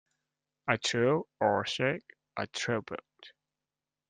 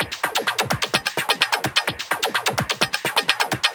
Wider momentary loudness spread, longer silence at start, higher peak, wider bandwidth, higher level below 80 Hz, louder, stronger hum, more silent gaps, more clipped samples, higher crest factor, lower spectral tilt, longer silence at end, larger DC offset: first, 13 LU vs 3 LU; first, 0.65 s vs 0 s; second, -10 dBFS vs 0 dBFS; second, 9.8 kHz vs over 20 kHz; second, -72 dBFS vs -54 dBFS; second, -31 LUFS vs -21 LUFS; neither; neither; neither; about the same, 24 dB vs 22 dB; first, -4.5 dB/octave vs -2 dB/octave; first, 0.8 s vs 0 s; neither